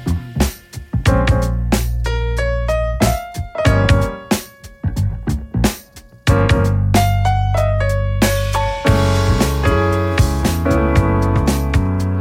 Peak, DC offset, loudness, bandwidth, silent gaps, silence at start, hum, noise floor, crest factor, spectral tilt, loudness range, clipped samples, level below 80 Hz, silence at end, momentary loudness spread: 0 dBFS; under 0.1%; -17 LUFS; 16.5 kHz; none; 0 s; none; -40 dBFS; 14 dB; -6 dB/octave; 3 LU; under 0.1%; -22 dBFS; 0 s; 7 LU